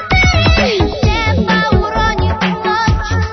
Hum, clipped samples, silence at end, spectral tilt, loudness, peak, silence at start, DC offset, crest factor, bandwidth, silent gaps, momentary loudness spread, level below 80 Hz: none; under 0.1%; 0 s; -5.5 dB/octave; -13 LUFS; 0 dBFS; 0 s; under 0.1%; 12 dB; 6.4 kHz; none; 5 LU; -20 dBFS